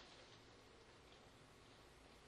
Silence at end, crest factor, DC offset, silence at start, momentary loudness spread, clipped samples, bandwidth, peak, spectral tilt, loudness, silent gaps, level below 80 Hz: 0 s; 14 dB; under 0.1%; 0 s; 3 LU; under 0.1%; 12 kHz; -50 dBFS; -3.5 dB/octave; -64 LUFS; none; -76 dBFS